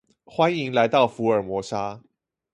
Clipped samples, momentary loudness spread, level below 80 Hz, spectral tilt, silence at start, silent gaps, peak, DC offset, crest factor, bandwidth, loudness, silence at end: under 0.1%; 11 LU; -60 dBFS; -6 dB/octave; 0.3 s; none; -4 dBFS; under 0.1%; 20 dB; 11.5 kHz; -23 LUFS; 0.55 s